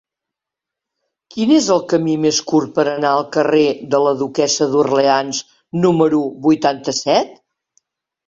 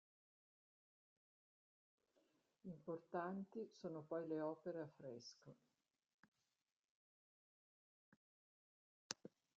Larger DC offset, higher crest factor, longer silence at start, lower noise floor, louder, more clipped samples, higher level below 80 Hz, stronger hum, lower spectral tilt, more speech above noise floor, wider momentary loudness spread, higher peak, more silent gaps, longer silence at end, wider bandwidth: neither; second, 16 dB vs 34 dB; second, 1.35 s vs 2.65 s; about the same, -84 dBFS vs -83 dBFS; first, -16 LUFS vs -51 LUFS; neither; first, -60 dBFS vs under -90 dBFS; neither; about the same, -4.5 dB/octave vs -5 dB/octave; first, 69 dB vs 32 dB; second, 6 LU vs 13 LU; first, 0 dBFS vs -22 dBFS; second, none vs 6.14-6.32 s, 6.72-9.10 s; first, 0.95 s vs 0.3 s; about the same, 7.8 kHz vs 7.4 kHz